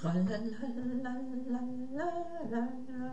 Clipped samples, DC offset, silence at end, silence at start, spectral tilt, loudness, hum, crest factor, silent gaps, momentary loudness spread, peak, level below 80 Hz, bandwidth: under 0.1%; 0.8%; 0 s; 0 s; -8 dB/octave; -37 LUFS; none; 14 dB; none; 6 LU; -22 dBFS; -66 dBFS; 8.4 kHz